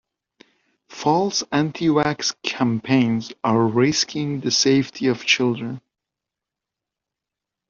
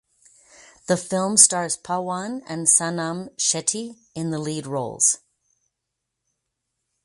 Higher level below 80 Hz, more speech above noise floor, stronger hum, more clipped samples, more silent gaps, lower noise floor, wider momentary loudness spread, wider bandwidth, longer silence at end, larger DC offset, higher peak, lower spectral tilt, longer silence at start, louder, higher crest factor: first, -60 dBFS vs -68 dBFS; first, 66 dB vs 59 dB; neither; neither; neither; first, -86 dBFS vs -81 dBFS; second, 6 LU vs 16 LU; second, 7.4 kHz vs 11.5 kHz; about the same, 1.9 s vs 1.9 s; neither; about the same, -2 dBFS vs 0 dBFS; first, -4 dB/octave vs -2.5 dB/octave; about the same, 0.9 s vs 0.9 s; about the same, -20 LUFS vs -21 LUFS; about the same, 20 dB vs 24 dB